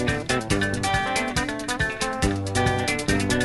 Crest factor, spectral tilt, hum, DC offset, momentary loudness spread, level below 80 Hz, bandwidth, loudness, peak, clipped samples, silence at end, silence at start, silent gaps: 16 dB; -4 dB/octave; none; under 0.1%; 3 LU; -38 dBFS; 12 kHz; -24 LUFS; -8 dBFS; under 0.1%; 0 s; 0 s; none